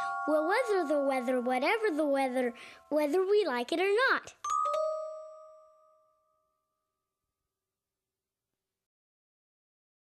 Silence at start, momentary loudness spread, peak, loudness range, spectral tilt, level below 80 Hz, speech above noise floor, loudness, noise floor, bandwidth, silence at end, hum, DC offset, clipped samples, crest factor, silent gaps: 0 s; 9 LU; -16 dBFS; 9 LU; -2.5 dB/octave; -84 dBFS; over 61 dB; -30 LUFS; under -90 dBFS; 13.5 kHz; 4.6 s; none; under 0.1%; under 0.1%; 16 dB; none